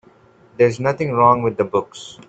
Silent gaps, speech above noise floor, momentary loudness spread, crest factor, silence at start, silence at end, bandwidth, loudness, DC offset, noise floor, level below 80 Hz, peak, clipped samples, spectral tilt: none; 33 dB; 8 LU; 18 dB; 0.6 s; 0.15 s; 8.2 kHz; -17 LUFS; under 0.1%; -51 dBFS; -56 dBFS; -2 dBFS; under 0.1%; -6.5 dB/octave